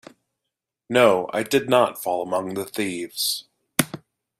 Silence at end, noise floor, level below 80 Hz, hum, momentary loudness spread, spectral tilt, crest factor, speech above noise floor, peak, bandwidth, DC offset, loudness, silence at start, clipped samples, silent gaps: 0.45 s; -83 dBFS; -64 dBFS; none; 11 LU; -3.5 dB/octave; 24 dB; 62 dB; 0 dBFS; 16 kHz; under 0.1%; -22 LUFS; 0.9 s; under 0.1%; none